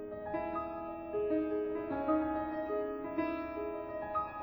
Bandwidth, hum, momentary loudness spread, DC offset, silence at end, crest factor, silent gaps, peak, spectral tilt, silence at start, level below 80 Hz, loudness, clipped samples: over 20 kHz; none; 7 LU; under 0.1%; 0 s; 16 dB; none; -20 dBFS; -9.5 dB/octave; 0 s; -60 dBFS; -37 LUFS; under 0.1%